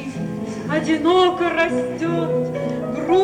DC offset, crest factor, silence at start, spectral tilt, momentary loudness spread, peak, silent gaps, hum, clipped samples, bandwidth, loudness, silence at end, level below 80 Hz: under 0.1%; 14 dB; 0 s; -6 dB/octave; 11 LU; -6 dBFS; none; none; under 0.1%; 10.5 kHz; -20 LUFS; 0 s; -52 dBFS